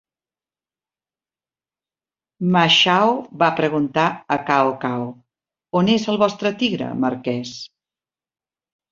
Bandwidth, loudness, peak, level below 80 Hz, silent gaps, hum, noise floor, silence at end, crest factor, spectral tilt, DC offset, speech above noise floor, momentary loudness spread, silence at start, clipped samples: 7.6 kHz; -19 LUFS; -2 dBFS; -62 dBFS; none; none; under -90 dBFS; 1.25 s; 20 dB; -5 dB/octave; under 0.1%; over 71 dB; 14 LU; 2.4 s; under 0.1%